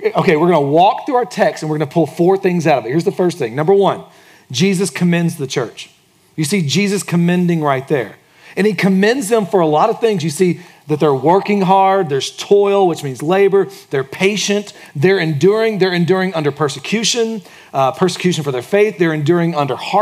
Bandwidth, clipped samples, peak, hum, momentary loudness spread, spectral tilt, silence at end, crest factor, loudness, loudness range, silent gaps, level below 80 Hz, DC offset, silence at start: 15.5 kHz; under 0.1%; 0 dBFS; none; 8 LU; -5.5 dB/octave; 0 s; 14 dB; -15 LUFS; 3 LU; none; -66 dBFS; under 0.1%; 0 s